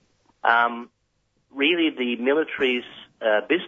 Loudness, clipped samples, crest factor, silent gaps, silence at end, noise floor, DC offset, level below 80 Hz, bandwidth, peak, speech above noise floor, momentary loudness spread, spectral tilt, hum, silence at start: -22 LUFS; under 0.1%; 20 dB; none; 0 s; -70 dBFS; under 0.1%; -72 dBFS; 7 kHz; -4 dBFS; 48 dB; 11 LU; -5.5 dB/octave; none; 0.45 s